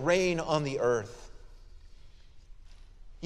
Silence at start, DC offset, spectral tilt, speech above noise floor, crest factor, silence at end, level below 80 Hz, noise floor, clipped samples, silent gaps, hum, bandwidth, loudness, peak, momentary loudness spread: 0 s; under 0.1%; -5 dB/octave; 22 dB; 20 dB; 0 s; -50 dBFS; -50 dBFS; under 0.1%; none; none; 12.5 kHz; -29 LUFS; -12 dBFS; 18 LU